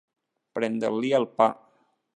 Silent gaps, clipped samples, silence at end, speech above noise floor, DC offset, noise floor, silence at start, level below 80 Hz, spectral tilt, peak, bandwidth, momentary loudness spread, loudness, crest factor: none; under 0.1%; 0.65 s; 41 dB; under 0.1%; -66 dBFS; 0.55 s; -80 dBFS; -6 dB/octave; -6 dBFS; 10 kHz; 12 LU; -25 LUFS; 22 dB